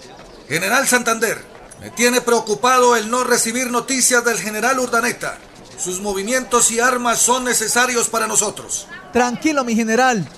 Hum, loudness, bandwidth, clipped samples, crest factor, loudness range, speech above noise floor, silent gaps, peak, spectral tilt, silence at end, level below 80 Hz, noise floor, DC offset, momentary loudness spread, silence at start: none; -16 LUFS; 14 kHz; under 0.1%; 16 dB; 2 LU; 22 dB; none; -2 dBFS; -2 dB/octave; 0 s; -52 dBFS; -39 dBFS; under 0.1%; 11 LU; 0 s